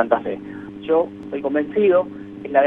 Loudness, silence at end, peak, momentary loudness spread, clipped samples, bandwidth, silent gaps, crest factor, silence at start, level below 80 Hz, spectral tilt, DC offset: -21 LUFS; 0 s; -2 dBFS; 15 LU; under 0.1%; 4.1 kHz; none; 18 dB; 0 s; -60 dBFS; -8.5 dB/octave; under 0.1%